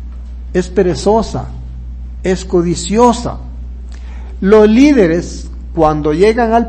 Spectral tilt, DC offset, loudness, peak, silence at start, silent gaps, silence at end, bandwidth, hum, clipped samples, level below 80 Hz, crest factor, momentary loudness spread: -6 dB/octave; under 0.1%; -12 LUFS; 0 dBFS; 0 s; none; 0 s; 8.8 kHz; none; 0.6%; -26 dBFS; 12 dB; 21 LU